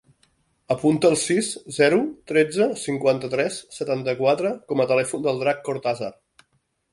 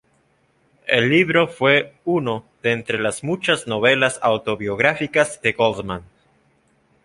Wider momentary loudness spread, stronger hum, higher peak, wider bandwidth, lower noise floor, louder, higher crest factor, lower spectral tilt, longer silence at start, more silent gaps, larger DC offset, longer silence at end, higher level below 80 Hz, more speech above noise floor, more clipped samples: about the same, 8 LU vs 8 LU; neither; about the same, -4 dBFS vs -2 dBFS; about the same, 11.5 kHz vs 11.5 kHz; first, -70 dBFS vs -62 dBFS; second, -22 LUFS vs -19 LUFS; about the same, 18 dB vs 20 dB; about the same, -4.5 dB/octave vs -4.5 dB/octave; second, 0.7 s vs 0.85 s; neither; neither; second, 0.8 s vs 1 s; second, -64 dBFS vs -56 dBFS; first, 48 dB vs 42 dB; neither